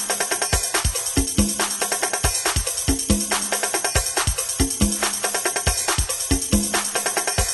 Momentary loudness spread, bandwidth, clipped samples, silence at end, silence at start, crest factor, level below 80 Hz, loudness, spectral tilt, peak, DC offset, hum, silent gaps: 2 LU; 12.5 kHz; under 0.1%; 0 s; 0 s; 18 dB; -30 dBFS; -20 LUFS; -2.5 dB/octave; -4 dBFS; under 0.1%; none; none